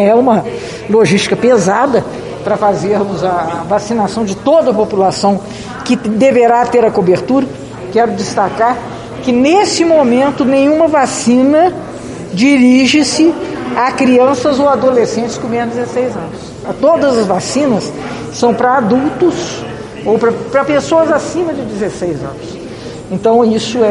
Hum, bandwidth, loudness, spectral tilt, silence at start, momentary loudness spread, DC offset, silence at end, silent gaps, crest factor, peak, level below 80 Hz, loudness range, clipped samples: none; 11.5 kHz; -12 LUFS; -5 dB/octave; 0 s; 13 LU; under 0.1%; 0 s; none; 12 dB; 0 dBFS; -44 dBFS; 4 LU; under 0.1%